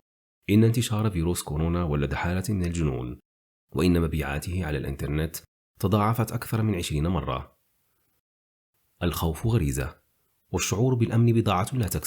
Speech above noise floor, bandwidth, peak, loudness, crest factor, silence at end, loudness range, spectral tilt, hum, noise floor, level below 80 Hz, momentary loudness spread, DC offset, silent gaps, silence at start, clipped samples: 46 dB; over 20 kHz; -10 dBFS; -26 LUFS; 16 dB; 0 s; 5 LU; -6 dB/octave; none; -71 dBFS; -42 dBFS; 11 LU; under 0.1%; 3.25-3.68 s, 5.48-5.74 s, 8.20-8.73 s; 0.5 s; under 0.1%